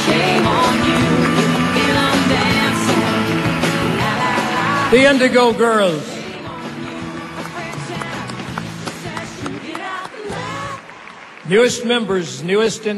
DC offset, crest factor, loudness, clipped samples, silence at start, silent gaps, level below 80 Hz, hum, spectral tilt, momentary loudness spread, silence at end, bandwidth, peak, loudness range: under 0.1%; 16 dB; -16 LUFS; under 0.1%; 0 s; none; -44 dBFS; none; -4.5 dB/octave; 14 LU; 0 s; 13.5 kHz; -2 dBFS; 12 LU